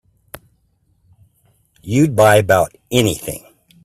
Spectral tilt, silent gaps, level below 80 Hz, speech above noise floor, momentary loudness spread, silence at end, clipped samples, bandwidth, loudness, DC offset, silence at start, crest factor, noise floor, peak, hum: -5 dB/octave; none; -48 dBFS; 47 dB; 18 LU; 0.45 s; under 0.1%; 16 kHz; -15 LUFS; under 0.1%; 1.85 s; 18 dB; -61 dBFS; 0 dBFS; none